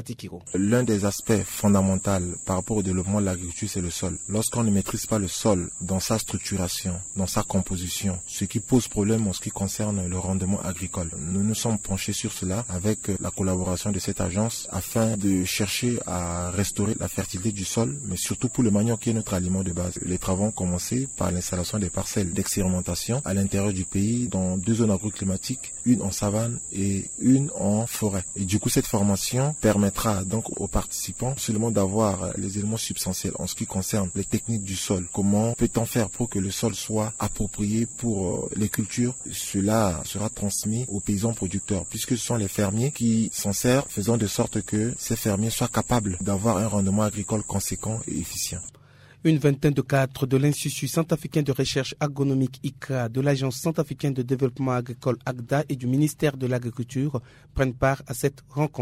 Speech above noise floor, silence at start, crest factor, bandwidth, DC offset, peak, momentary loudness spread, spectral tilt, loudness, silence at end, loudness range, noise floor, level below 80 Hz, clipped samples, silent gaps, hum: 27 dB; 0 s; 16 dB; 16 kHz; under 0.1%; -8 dBFS; 6 LU; -5 dB/octave; -25 LUFS; 0 s; 2 LU; -52 dBFS; -46 dBFS; under 0.1%; none; none